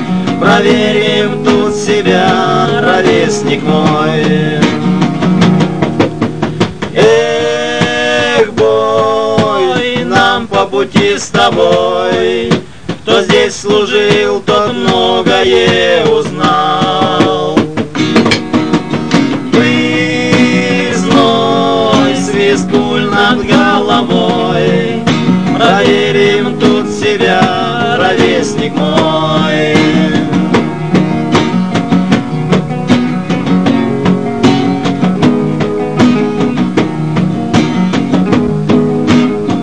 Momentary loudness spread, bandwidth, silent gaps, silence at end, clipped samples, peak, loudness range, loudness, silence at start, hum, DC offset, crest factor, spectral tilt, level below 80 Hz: 4 LU; 11 kHz; none; 0 s; 0.8%; 0 dBFS; 2 LU; -10 LUFS; 0 s; none; 2%; 10 dB; -5.5 dB/octave; -40 dBFS